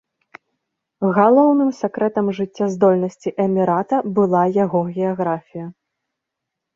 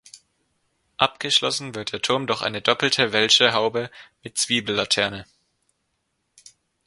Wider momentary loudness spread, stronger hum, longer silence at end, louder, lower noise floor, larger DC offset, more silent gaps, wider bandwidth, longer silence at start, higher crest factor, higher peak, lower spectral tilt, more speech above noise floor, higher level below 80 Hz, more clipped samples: second, 10 LU vs 14 LU; neither; second, 1.05 s vs 1.65 s; first, -18 LUFS vs -21 LUFS; first, -81 dBFS vs -74 dBFS; neither; neither; second, 7.4 kHz vs 11.5 kHz; first, 1 s vs 0.15 s; second, 18 dB vs 24 dB; about the same, -2 dBFS vs 0 dBFS; first, -8.5 dB/octave vs -2 dB/octave; first, 64 dB vs 52 dB; about the same, -64 dBFS vs -62 dBFS; neither